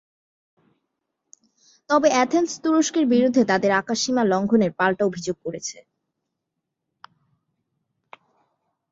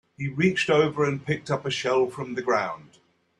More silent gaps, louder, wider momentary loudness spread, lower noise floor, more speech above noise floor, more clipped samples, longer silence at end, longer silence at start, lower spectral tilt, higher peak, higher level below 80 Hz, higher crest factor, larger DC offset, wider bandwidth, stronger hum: neither; first, -21 LUFS vs -25 LUFS; about the same, 11 LU vs 10 LU; first, -81 dBFS vs -62 dBFS; first, 61 dB vs 37 dB; neither; first, 3.1 s vs 0.55 s; first, 1.9 s vs 0.2 s; about the same, -4.5 dB/octave vs -5.5 dB/octave; first, -4 dBFS vs -8 dBFS; about the same, -66 dBFS vs -64 dBFS; about the same, 20 dB vs 18 dB; neither; second, 7.8 kHz vs 11 kHz; neither